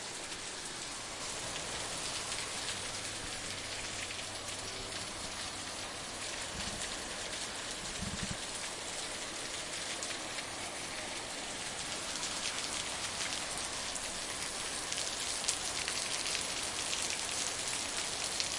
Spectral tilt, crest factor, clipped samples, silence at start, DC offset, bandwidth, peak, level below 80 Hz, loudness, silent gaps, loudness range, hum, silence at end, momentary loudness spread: -0.5 dB/octave; 30 dB; under 0.1%; 0 s; under 0.1%; 11.5 kHz; -10 dBFS; -58 dBFS; -37 LUFS; none; 5 LU; none; 0 s; 5 LU